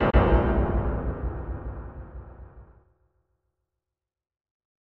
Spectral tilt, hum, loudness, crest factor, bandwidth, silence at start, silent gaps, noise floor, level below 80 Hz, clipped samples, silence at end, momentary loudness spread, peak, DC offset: -10.5 dB/octave; none; -26 LUFS; 22 dB; 4.3 kHz; 0 s; none; -88 dBFS; -32 dBFS; under 0.1%; 2.35 s; 23 LU; -6 dBFS; under 0.1%